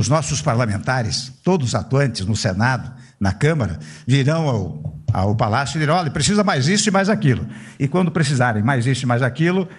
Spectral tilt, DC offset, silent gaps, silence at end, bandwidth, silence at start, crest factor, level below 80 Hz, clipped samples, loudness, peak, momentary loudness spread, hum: -5.5 dB/octave; under 0.1%; none; 0 s; 11 kHz; 0 s; 14 dB; -46 dBFS; under 0.1%; -19 LUFS; -4 dBFS; 7 LU; none